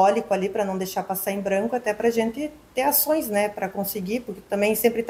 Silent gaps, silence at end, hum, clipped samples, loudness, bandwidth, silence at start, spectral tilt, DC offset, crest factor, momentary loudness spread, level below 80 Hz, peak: none; 0 s; none; under 0.1%; -24 LUFS; 16 kHz; 0 s; -4.5 dB/octave; under 0.1%; 18 dB; 9 LU; -58 dBFS; -6 dBFS